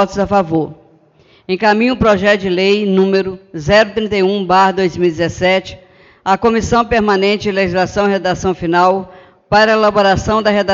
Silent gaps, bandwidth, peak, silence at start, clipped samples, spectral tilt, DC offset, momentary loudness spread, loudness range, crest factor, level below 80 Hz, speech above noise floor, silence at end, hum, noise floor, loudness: none; 7.6 kHz; 0 dBFS; 0 s; under 0.1%; -5.5 dB/octave; under 0.1%; 6 LU; 2 LU; 14 dB; -38 dBFS; 36 dB; 0 s; none; -49 dBFS; -13 LUFS